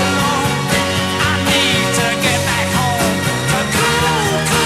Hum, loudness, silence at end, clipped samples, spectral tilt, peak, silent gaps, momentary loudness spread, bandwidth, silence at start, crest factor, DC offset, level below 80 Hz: none; -15 LUFS; 0 s; under 0.1%; -3.5 dB/octave; -2 dBFS; none; 3 LU; 16 kHz; 0 s; 14 dB; 0.1%; -36 dBFS